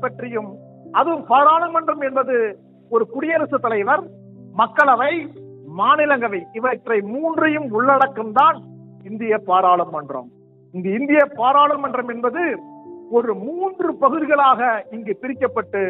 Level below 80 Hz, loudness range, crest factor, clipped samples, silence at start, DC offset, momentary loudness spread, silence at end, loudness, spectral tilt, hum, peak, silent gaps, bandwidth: -72 dBFS; 2 LU; 18 dB; under 0.1%; 0 s; under 0.1%; 13 LU; 0 s; -18 LUFS; -7.5 dB/octave; none; -2 dBFS; none; 4.7 kHz